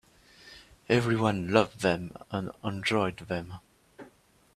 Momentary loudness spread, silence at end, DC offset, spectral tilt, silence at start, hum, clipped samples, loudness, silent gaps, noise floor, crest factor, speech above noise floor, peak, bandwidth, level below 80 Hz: 23 LU; 0.5 s; under 0.1%; -6 dB/octave; 0.45 s; none; under 0.1%; -29 LUFS; none; -61 dBFS; 26 dB; 33 dB; -4 dBFS; 14 kHz; -60 dBFS